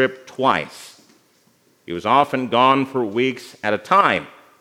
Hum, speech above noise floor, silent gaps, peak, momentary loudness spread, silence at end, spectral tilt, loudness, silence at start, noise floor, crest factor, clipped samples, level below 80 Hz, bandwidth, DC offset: none; 40 dB; none; 0 dBFS; 11 LU; 0.3 s; -5 dB/octave; -19 LUFS; 0 s; -59 dBFS; 20 dB; under 0.1%; -68 dBFS; 16 kHz; under 0.1%